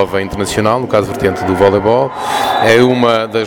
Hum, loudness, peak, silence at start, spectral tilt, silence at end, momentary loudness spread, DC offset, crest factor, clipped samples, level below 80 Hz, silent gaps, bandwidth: none; -12 LUFS; 0 dBFS; 0 s; -5 dB/octave; 0 s; 7 LU; under 0.1%; 12 dB; under 0.1%; -40 dBFS; none; 19 kHz